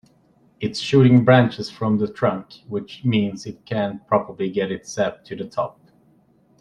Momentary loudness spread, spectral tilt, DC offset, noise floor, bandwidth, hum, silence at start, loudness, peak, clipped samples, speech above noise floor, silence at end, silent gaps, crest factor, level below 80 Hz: 16 LU; -7 dB/octave; under 0.1%; -58 dBFS; 9.8 kHz; none; 0.6 s; -21 LUFS; -2 dBFS; under 0.1%; 37 dB; 0.9 s; none; 20 dB; -58 dBFS